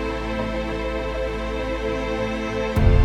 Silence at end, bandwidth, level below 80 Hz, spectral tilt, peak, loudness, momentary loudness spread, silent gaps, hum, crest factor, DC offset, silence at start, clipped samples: 0 s; 11.5 kHz; -26 dBFS; -7 dB/octave; -4 dBFS; -25 LUFS; 5 LU; none; none; 18 dB; under 0.1%; 0 s; under 0.1%